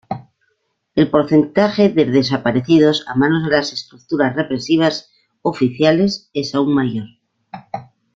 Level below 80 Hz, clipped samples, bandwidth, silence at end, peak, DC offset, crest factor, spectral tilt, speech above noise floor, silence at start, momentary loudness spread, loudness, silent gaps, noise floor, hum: -54 dBFS; under 0.1%; 7.6 kHz; 0.35 s; 0 dBFS; under 0.1%; 16 dB; -6.5 dB/octave; 52 dB; 0.1 s; 16 LU; -16 LUFS; none; -68 dBFS; none